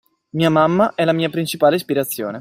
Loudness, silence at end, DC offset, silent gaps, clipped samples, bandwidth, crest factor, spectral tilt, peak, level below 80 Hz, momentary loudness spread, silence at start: -17 LUFS; 0 s; under 0.1%; none; under 0.1%; 16 kHz; 16 dB; -5.5 dB/octave; -2 dBFS; -60 dBFS; 6 LU; 0.35 s